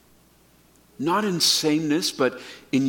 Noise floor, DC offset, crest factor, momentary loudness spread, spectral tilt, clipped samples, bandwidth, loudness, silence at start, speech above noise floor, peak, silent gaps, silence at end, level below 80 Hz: -57 dBFS; under 0.1%; 18 dB; 9 LU; -3.5 dB/octave; under 0.1%; 17.5 kHz; -22 LUFS; 1 s; 34 dB; -6 dBFS; none; 0 s; -66 dBFS